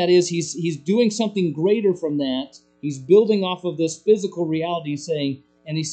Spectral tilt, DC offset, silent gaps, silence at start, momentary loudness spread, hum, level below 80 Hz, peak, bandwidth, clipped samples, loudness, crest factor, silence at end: -5.5 dB/octave; under 0.1%; none; 0 s; 12 LU; none; -68 dBFS; -4 dBFS; 9 kHz; under 0.1%; -21 LUFS; 16 dB; 0 s